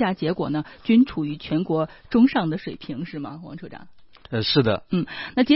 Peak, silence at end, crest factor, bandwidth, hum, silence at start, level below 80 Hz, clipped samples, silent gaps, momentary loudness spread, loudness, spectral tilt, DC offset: -4 dBFS; 0 s; 18 dB; 5.8 kHz; none; 0 s; -54 dBFS; under 0.1%; none; 16 LU; -23 LUFS; -10.5 dB/octave; under 0.1%